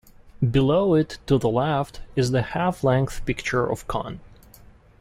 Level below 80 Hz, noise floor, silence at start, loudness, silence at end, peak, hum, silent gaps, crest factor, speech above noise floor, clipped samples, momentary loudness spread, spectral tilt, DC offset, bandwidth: -42 dBFS; -50 dBFS; 0.25 s; -23 LUFS; 0.75 s; -8 dBFS; none; none; 16 dB; 28 dB; under 0.1%; 9 LU; -7 dB/octave; under 0.1%; 14.5 kHz